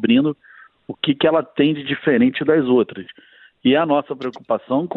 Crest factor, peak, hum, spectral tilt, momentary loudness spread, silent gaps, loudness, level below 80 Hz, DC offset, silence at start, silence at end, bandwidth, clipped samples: 16 dB; -2 dBFS; none; -8.5 dB/octave; 12 LU; none; -19 LUFS; -60 dBFS; under 0.1%; 0 s; 0 s; 4.4 kHz; under 0.1%